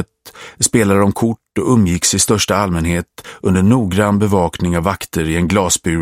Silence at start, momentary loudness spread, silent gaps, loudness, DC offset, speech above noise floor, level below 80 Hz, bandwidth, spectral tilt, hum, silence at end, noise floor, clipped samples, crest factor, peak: 0 s; 8 LU; none; -15 LUFS; under 0.1%; 23 dB; -36 dBFS; 16.5 kHz; -4.5 dB/octave; none; 0 s; -38 dBFS; under 0.1%; 14 dB; 0 dBFS